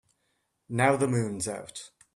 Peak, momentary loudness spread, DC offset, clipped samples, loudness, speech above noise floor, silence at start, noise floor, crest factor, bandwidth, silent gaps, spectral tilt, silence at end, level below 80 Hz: -8 dBFS; 17 LU; under 0.1%; under 0.1%; -27 LUFS; 48 dB; 0.7 s; -76 dBFS; 22 dB; 13 kHz; none; -5.5 dB/octave; 0.3 s; -66 dBFS